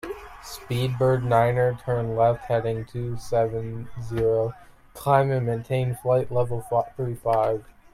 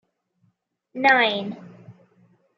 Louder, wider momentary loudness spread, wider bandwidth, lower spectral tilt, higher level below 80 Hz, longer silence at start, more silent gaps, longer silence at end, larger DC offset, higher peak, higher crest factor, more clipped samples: second, -24 LUFS vs -19 LUFS; second, 11 LU vs 23 LU; first, 15 kHz vs 7.6 kHz; first, -7.5 dB/octave vs -4.5 dB/octave; first, -48 dBFS vs -82 dBFS; second, 0.05 s vs 0.95 s; neither; second, 0.3 s vs 0.65 s; neither; about the same, -6 dBFS vs -4 dBFS; about the same, 18 dB vs 22 dB; neither